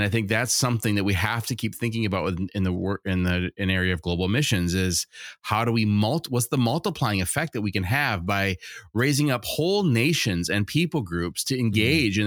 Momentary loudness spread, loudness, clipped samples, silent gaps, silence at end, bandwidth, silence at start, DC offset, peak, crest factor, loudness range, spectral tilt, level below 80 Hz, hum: 6 LU; -24 LUFS; under 0.1%; none; 0 s; 19 kHz; 0 s; under 0.1%; -6 dBFS; 18 dB; 2 LU; -4.5 dB/octave; -48 dBFS; none